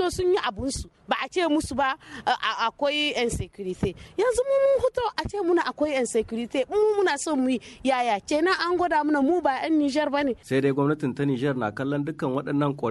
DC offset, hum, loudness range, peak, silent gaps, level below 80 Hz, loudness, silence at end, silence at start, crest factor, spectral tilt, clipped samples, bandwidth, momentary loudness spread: under 0.1%; none; 2 LU; -10 dBFS; none; -48 dBFS; -25 LUFS; 0 s; 0 s; 14 dB; -5 dB/octave; under 0.1%; 12.5 kHz; 7 LU